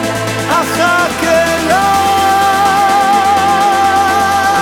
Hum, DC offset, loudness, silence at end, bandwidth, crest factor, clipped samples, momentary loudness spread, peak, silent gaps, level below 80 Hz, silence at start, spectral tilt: none; under 0.1%; -11 LUFS; 0 s; 19.5 kHz; 10 dB; under 0.1%; 3 LU; 0 dBFS; none; -40 dBFS; 0 s; -3 dB/octave